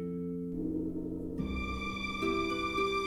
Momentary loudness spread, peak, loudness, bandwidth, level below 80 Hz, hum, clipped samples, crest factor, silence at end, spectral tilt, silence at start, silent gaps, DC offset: 6 LU; -20 dBFS; -35 LUFS; 15.5 kHz; -48 dBFS; none; under 0.1%; 14 dB; 0 s; -6 dB/octave; 0 s; none; under 0.1%